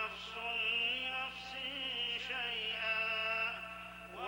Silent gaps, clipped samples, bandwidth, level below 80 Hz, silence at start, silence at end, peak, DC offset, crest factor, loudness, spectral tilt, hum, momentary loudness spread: none; under 0.1%; over 20 kHz; -66 dBFS; 0 s; 0 s; -24 dBFS; under 0.1%; 16 dB; -36 LUFS; -2 dB/octave; 60 Hz at -60 dBFS; 9 LU